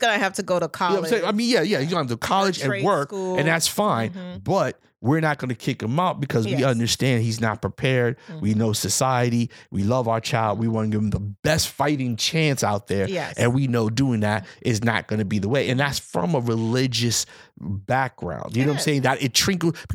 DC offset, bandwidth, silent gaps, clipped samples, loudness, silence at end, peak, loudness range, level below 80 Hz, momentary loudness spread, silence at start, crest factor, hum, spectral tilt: under 0.1%; 17.5 kHz; 11.39-11.43 s; under 0.1%; -22 LUFS; 0 s; -4 dBFS; 1 LU; -54 dBFS; 6 LU; 0 s; 20 dB; none; -4.5 dB/octave